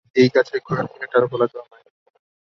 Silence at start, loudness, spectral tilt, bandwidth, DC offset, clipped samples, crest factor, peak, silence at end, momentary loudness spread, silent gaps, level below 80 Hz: 0.15 s; -20 LUFS; -7 dB/octave; 7 kHz; under 0.1%; under 0.1%; 18 dB; -2 dBFS; 0.9 s; 9 LU; none; -62 dBFS